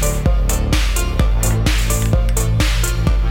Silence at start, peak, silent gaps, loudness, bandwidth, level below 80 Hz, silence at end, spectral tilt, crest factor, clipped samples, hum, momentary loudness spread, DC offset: 0 s; -4 dBFS; none; -17 LUFS; 17 kHz; -16 dBFS; 0 s; -4.5 dB/octave; 12 dB; under 0.1%; none; 1 LU; under 0.1%